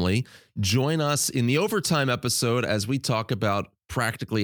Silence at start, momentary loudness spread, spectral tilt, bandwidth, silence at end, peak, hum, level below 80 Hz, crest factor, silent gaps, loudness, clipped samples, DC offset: 0 s; 5 LU; -4.5 dB/octave; 19.5 kHz; 0 s; -10 dBFS; none; -54 dBFS; 16 dB; none; -25 LUFS; under 0.1%; under 0.1%